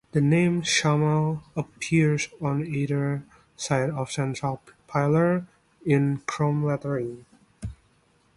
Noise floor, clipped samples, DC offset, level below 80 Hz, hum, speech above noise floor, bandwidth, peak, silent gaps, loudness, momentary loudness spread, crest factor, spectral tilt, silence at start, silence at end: -63 dBFS; under 0.1%; under 0.1%; -54 dBFS; none; 39 dB; 11.5 kHz; -8 dBFS; none; -25 LUFS; 14 LU; 18 dB; -6 dB/octave; 0.15 s; 0.6 s